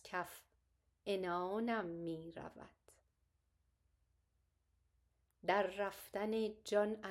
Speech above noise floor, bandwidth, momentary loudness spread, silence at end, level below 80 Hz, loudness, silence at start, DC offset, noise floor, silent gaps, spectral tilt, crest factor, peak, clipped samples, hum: 41 dB; 16 kHz; 15 LU; 0 s; -76 dBFS; -41 LUFS; 0.05 s; under 0.1%; -81 dBFS; none; -5 dB/octave; 22 dB; -22 dBFS; under 0.1%; none